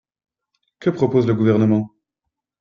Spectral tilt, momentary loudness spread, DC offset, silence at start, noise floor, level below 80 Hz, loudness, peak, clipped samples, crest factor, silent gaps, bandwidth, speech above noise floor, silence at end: -9.5 dB/octave; 8 LU; under 0.1%; 0.8 s; -81 dBFS; -58 dBFS; -18 LUFS; -4 dBFS; under 0.1%; 18 dB; none; 7.2 kHz; 65 dB; 0.75 s